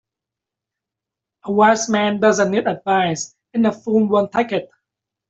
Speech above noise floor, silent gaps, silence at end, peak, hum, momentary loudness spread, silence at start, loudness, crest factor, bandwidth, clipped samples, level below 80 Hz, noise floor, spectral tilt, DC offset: 68 dB; none; 0.65 s; -2 dBFS; none; 10 LU; 1.45 s; -18 LUFS; 16 dB; 8 kHz; under 0.1%; -62 dBFS; -86 dBFS; -4.5 dB/octave; under 0.1%